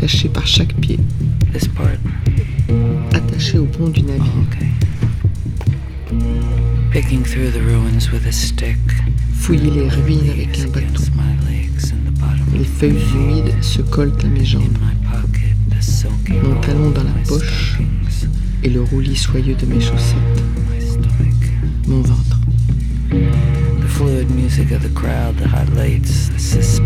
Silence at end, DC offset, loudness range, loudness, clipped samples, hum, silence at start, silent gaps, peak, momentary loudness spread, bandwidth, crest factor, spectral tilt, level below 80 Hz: 0 s; under 0.1%; 1 LU; -16 LUFS; under 0.1%; none; 0 s; none; 0 dBFS; 4 LU; 14.5 kHz; 14 dB; -6 dB/octave; -18 dBFS